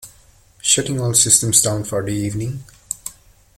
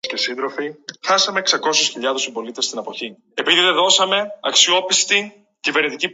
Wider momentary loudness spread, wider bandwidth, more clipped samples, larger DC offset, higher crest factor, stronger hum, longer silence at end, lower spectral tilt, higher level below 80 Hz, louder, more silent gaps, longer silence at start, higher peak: first, 17 LU vs 14 LU; first, 16.5 kHz vs 9 kHz; neither; neither; about the same, 20 dB vs 20 dB; neither; first, 0.45 s vs 0 s; first, -3 dB/octave vs 0 dB/octave; first, -48 dBFS vs -74 dBFS; about the same, -16 LUFS vs -17 LUFS; neither; about the same, 0 s vs 0.05 s; about the same, 0 dBFS vs 0 dBFS